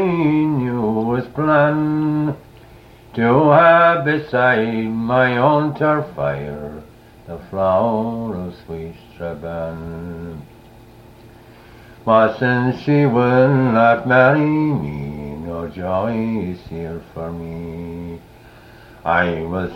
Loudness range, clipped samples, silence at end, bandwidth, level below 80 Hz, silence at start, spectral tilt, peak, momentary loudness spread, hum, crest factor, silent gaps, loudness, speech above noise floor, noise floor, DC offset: 11 LU; under 0.1%; 0 s; 6.4 kHz; -46 dBFS; 0 s; -9 dB/octave; 0 dBFS; 18 LU; none; 18 dB; none; -17 LUFS; 26 dB; -43 dBFS; under 0.1%